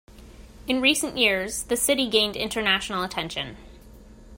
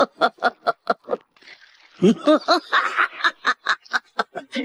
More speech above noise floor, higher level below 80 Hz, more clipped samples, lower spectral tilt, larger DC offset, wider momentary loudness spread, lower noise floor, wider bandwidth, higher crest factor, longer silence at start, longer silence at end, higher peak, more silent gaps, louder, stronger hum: second, 22 dB vs 30 dB; first, -48 dBFS vs -74 dBFS; neither; second, -2 dB/octave vs -5 dB/octave; neither; about the same, 10 LU vs 10 LU; about the same, -47 dBFS vs -49 dBFS; first, 16.5 kHz vs 12.5 kHz; about the same, 22 dB vs 18 dB; about the same, 0.1 s vs 0 s; about the same, 0 s vs 0 s; about the same, -4 dBFS vs -4 dBFS; neither; about the same, -23 LUFS vs -21 LUFS; neither